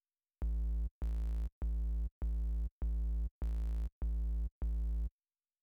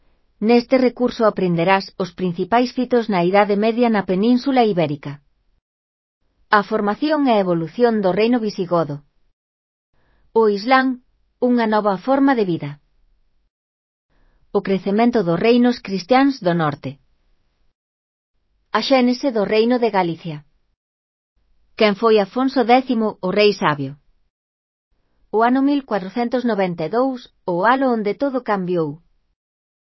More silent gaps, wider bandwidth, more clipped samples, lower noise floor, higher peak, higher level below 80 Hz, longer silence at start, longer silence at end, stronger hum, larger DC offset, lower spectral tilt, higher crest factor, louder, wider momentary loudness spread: second, 0.91-1.01 s, 1.52-1.61 s, 2.11-2.21 s, 2.71-2.81 s, 3.31-3.41 s, 3.92-4.01 s, 4.51-4.61 s vs 5.61-6.21 s, 9.33-9.93 s, 13.50-14.09 s, 17.75-18.34 s, 20.77-21.36 s, 24.30-24.91 s; second, 2.1 kHz vs 6 kHz; neither; first, under -90 dBFS vs -61 dBFS; second, -28 dBFS vs 0 dBFS; first, -36 dBFS vs -60 dBFS; about the same, 0.4 s vs 0.4 s; second, 0.55 s vs 1 s; neither; neither; first, -9 dB/octave vs -7 dB/octave; second, 8 dB vs 20 dB; second, -40 LUFS vs -18 LUFS; second, 2 LU vs 8 LU